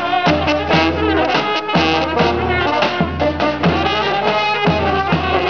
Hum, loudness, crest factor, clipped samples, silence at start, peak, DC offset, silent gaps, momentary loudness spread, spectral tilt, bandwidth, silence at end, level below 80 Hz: none; -16 LUFS; 12 dB; under 0.1%; 0 s; -4 dBFS; 0.6%; none; 2 LU; -6 dB/octave; 7 kHz; 0 s; -34 dBFS